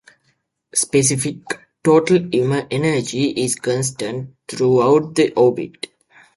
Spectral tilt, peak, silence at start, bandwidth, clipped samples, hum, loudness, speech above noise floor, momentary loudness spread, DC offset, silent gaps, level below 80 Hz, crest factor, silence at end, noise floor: -4.5 dB/octave; -2 dBFS; 0.75 s; 11.5 kHz; under 0.1%; none; -18 LUFS; 49 dB; 15 LU; under 0.1%; none; -56 dBFS; 16 dB; 0.65 s; -66 dBFS